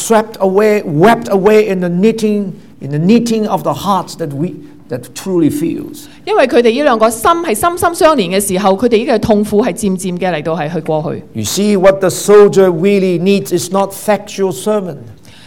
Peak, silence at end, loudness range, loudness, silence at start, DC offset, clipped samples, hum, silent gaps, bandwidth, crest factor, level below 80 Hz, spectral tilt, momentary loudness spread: 0 dBFS; 0.3 s; 4 LU; -12 LUFS; 0 s; 0.9%; under 0.1%; none; none; 17 kHz; 12 dB; -44 dBFS; -5.5 dB/octave; 11 LU